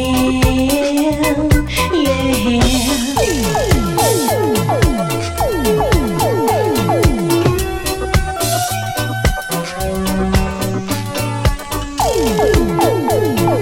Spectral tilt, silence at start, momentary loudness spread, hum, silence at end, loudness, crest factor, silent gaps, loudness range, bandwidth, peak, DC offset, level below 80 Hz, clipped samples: -5 dB/octave; 0 s; 6 LU; none; 0 s; -15 LUFS; 14 dB; none; 3 LU; 17 kHz; 0 dBFS; under 0.1%; -24 dBFS; under 0.1%